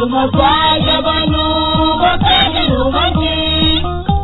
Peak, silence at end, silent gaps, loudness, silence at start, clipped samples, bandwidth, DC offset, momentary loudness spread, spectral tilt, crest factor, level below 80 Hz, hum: 0 dBFS; 0 s; none; -12 LUFS; 0 s; under 0.1%; 4.1 kHz; under 0.1%; 4 LU; -7.5 dB/octave; 12 dB; -24 dBFS; none